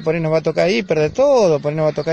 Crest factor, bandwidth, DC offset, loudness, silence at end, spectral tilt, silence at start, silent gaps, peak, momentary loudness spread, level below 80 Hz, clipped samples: 12 dB; 9.4 kHz; under 0.1%; -16 LUFS; 0 s; -6 dB/octave; 0 s; none; -4 dBFS; 5 LU; -50 dBFS; under 0.1%